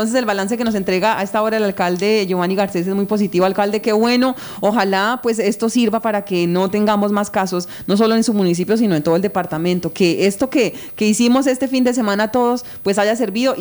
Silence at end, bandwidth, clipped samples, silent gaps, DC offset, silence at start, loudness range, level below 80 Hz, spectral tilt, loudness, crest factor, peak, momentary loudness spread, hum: 0 s; over 20 kHz; under 0.1%; none; under 0.1%; 0 s; 1 LU; -54 dBFS; -5 dB/octave; -17 LUFS; 14 dB; -2 dBFS; 4 LU; none